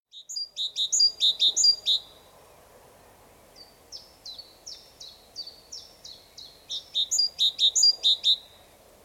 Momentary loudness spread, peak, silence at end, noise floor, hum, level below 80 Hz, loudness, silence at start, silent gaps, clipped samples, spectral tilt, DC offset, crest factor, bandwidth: 26 LU; -10 dBFS; 0.65 s; -54 dBFS; none; -68 dBFS; -21 LUFS; 0.15 s; none; under 0.1%; 3 dB/octave; under 0.1%; 18 dB; 17 kHz